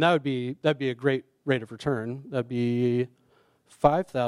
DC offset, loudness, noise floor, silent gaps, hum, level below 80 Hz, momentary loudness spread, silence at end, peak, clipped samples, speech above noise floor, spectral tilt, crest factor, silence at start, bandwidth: under 0.1%; -27 LUFS; -64 dBFS; none; none; -60 dBFS; 8 LU; 0 s; -6 dBFS; under 0.1%; 38 dB; -7 dB/octave; 20 dB; 0 s; 11.5 kHz